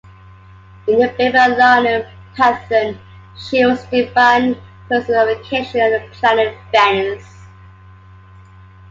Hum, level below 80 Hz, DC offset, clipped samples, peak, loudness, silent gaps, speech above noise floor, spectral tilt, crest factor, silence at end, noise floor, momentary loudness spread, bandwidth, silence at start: none; -48 dBFS; under 0.1%; under 0.1%; 0 dBFS; -15 LUFS; none; 27 dB; -5 dB/octave; 16 dB; 1.45 s; -41 dBFS; 13 LU; 7.8 kHz; 0.85 s